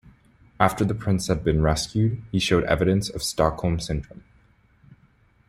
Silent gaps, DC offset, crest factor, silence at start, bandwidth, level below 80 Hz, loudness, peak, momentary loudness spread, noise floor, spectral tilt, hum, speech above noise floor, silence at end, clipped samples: none; under 0.1%; 22 dB; 0.05 s; 15.5 kHz; -40 dBFS; -23 LUFS; -2 dBFS; 6 LU; -59 dBFS; -5.5 dB/octave; none; 37 dB; 1.3 s; under 0.1%